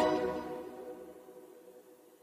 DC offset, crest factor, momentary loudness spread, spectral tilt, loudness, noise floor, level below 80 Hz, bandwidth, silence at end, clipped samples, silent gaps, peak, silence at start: under 0.1%; 20 dB; 23 LU; -5.5 dB/octave; -38 LUFS; -58 dBFS; -66 dBFS; 15 kHz; 0.05 s; under 0.1%; none; -18 dBFS; 0 s